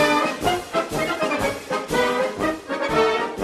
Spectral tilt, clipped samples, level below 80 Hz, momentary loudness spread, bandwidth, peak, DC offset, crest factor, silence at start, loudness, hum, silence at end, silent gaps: -4 dB/octave; under 0.1%; -46 dBFS; 5 LU; 14 kHz; -6 dBFS; under 0.1%; 16 dB; 0 s; -22 LUFS; none; 0 s; none